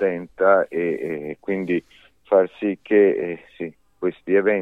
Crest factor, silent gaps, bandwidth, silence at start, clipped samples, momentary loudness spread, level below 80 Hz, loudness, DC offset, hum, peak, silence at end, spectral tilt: 18 dB; none; 4 kHz; 0 s; under 0.1%; 13 LU; -64 dBFS; -21 LUFS; under 0.1%; none; -4 dBFS; 0 s; -8.5 dB/octave